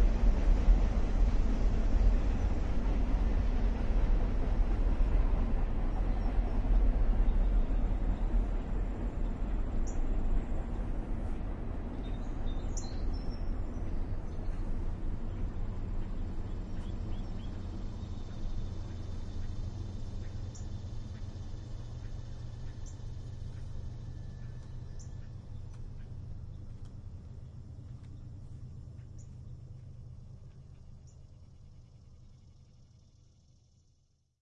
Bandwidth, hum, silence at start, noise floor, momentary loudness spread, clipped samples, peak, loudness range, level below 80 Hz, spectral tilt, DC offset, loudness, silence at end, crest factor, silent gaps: 7.6 kHz; none; 0 s; -71 dBFS; 16 LU; under 0.1%; -14 dBFS; 16 LU; -32 dBFS; -7.5 dB/octave; under 0.1%; -37 LUFS; 1.9 s; 18 dB; none